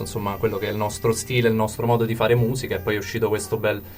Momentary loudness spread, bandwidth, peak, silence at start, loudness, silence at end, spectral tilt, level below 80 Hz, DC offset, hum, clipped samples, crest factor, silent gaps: 5 LU; 16 kHz; -6 dBFS; 0 s; -23 LUFS; 0 s; -5.5 dB/octave; -46 dBFS; under 0.1%; none; under 0.1%; 16 dB; none